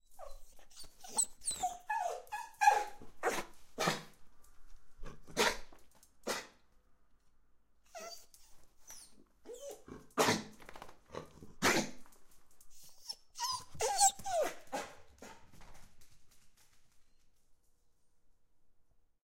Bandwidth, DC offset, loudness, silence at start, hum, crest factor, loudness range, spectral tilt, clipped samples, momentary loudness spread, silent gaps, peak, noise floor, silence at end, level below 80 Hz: 16 kHz; under 0.1%; -35 LUFS; 0.1 s; none; 26 dB; 14 LU; -1.5 dB/octave; under 0.1%; 25 LU; none; -14 dBFS; -67 dBFS; 0.4 s; -60 dBFS